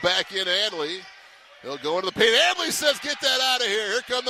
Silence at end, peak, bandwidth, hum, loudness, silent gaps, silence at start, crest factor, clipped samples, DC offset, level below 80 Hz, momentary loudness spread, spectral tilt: 0 s; -6 dBFS; 15 kHz; none; -22 LUFS; none; 0 s; 18 dB; under 0.1%; under 0.1%; -64 dBFS; 13 LU; -1 dB/octave